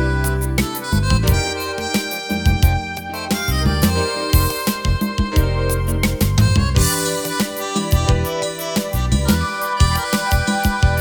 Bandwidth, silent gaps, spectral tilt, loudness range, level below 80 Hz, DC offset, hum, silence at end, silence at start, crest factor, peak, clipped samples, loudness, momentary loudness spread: over 20 kHz; none; -4.5 dB/octave; 1 LU; -22 dBFS; under 0.1%; none; 0 s; 0 s; 16 dB; -2 dBFS; under 0.1%; -18 LUFS; 5 LU